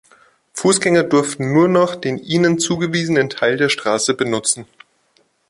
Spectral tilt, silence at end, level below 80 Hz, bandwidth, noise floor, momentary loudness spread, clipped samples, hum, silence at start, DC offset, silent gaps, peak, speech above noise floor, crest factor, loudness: -4 dB/octave; 0.85 s; -58 dBFS; 11.5 kHz; -60 dBFS; 6 LU; under 0.1%; none; 0.55 s; under 0.1%; none; -2 dBFS; 44 dB; 16 dB; -17 LUFS